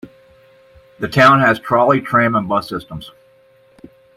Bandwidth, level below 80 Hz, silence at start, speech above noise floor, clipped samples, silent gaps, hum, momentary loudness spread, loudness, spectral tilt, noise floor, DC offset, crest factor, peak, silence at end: 15.5 kHz; -52 dBFS; 0.05 s; 37 dB; under 0.1%; none; none; 18 LU; -14 LUFS; -6.5 dB/octave; -51 dBFS; under 0.1%; 16 dB; 0 dBFS; 1.1 s